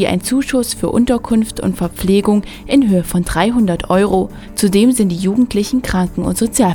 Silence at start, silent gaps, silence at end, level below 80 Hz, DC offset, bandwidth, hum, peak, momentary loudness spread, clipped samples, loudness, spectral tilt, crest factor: 0 s; none; 0 s; -32 dBFS; under 0.1%; 19.5 kHz; none; 0 dBFS; 5 LU; under 0.1%; -15 LUFS; -5.5 dB/octave; 14 dB